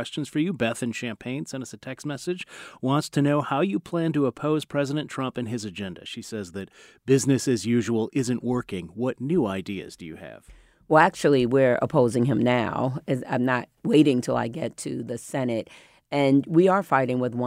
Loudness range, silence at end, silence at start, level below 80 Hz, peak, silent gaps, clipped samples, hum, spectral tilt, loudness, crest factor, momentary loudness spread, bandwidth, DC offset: 6 LU; 0 s; 0 s; -60 dBFS; -4 dBFS; none; under 0.1%; none; -6 dB/octave; -25 LUFS; 20 dB; 15 LU; 16 kHz; under 0.1%